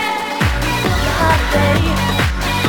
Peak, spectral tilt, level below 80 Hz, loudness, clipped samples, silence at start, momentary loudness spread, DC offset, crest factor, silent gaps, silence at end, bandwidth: -2 dBFS; -5 dB/octave; -24 dBFS; -16 LUFS; under 0.1%; 0 s; 3 LU; under 0.1%; 14 dB; none; 0 s; 19 kHz